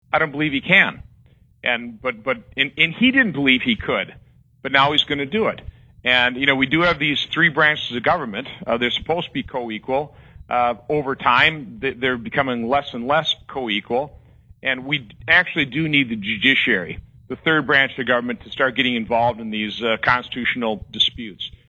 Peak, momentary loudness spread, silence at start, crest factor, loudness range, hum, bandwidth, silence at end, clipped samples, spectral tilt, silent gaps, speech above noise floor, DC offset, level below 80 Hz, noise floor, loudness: 0 dBFS; 11 LU; 0.15 s; 20 dB; 3 LU; none; 8 kHz; 0.2 s; under 0.1%; -5.5 dB/octave; none; 33 dB; under 0.1%; -50 dBFS; -53 dBFS; -19 LUFS